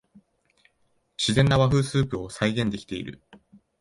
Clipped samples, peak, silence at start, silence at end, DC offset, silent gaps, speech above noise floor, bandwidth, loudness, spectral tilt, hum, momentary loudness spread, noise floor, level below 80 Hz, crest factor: under 0.1%; -8 dBFS; 1.2 s; 0.7 s; under 0.1%; none; 46 dB; 11.5 kHz; -24 LUFS; -5.5 dB/octave; none; 15 LU; -69 dBFS; -48 dBFS; 18 dB